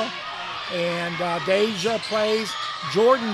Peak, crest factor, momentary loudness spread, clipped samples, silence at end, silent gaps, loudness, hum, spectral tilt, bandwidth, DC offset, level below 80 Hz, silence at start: -6 dBFS; 18 dB; 9 LU; under 0.1%; 0 s; none; -23 LUFS; none; -4 dB/octave; 14 kHz; under 0.1%; -62 dBFS; 0 s